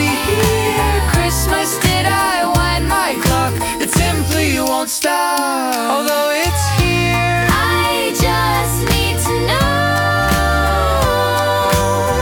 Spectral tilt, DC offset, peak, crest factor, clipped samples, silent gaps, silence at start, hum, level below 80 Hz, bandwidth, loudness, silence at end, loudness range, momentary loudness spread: -4 dB/octave; under 0.1%; 0 dBFS; 14 dB; under 0.1%; none; 0 s; none; -26 dBFS; 19 kHz; -15 LUFS; 0 s; 1 LU; 2 LU